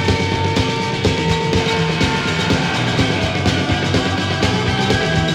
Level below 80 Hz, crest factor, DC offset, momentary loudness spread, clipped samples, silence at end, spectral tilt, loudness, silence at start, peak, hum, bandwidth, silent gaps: -34 dBFS; 16 dB; 0.1%; 1 LU; under 0.1%; 0 s; -5 dB/octave; -17 LUFS; 0 s; -2 dBFS; none; 13 kHz; none